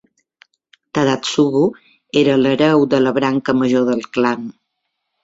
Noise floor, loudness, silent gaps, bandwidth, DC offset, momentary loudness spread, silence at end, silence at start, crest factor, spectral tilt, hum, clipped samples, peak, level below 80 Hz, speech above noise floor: -74 dBFS; -16 LUFS; none; 8 kHz; under 0.1%; 6 LU; 0.75 s; 0.95 s; 16 dB; -5.5 dB/octave; none; under 0.1%; -2 dBFS; -58 dBFS; 59 dB